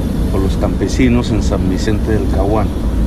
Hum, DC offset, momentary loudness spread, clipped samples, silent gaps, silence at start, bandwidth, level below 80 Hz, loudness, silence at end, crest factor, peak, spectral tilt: none; under 0.1%; 3 LU; under 0.1%; none; 0 s; 14 kHz; -18 dBFS; -15 LUFS; 0 s; 12 dB; -2 dBFS; -7 dB/octave